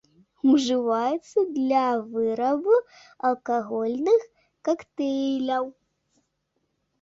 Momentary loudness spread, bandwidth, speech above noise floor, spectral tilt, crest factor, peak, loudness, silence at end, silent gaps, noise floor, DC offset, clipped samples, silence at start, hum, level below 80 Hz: 7 LU; 7.8 kHz; 52 dB; -4.5 dB/octave; 16 dB; -10 dBFS; -24 LUFS; 1.3 s; none; -75 dBFS; under 0.1%; under 0.1%; 0.45 s; none; -70 dBFS